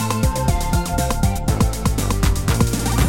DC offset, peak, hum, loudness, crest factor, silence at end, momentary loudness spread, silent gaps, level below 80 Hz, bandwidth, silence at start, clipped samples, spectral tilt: 1%; -4 dBFS; none; -20 LUFS; 14 dB; 0 s; 2 LU; none; -22 dBFS; 17 kHz; 0 s; under 0.1%; -5 dB/octave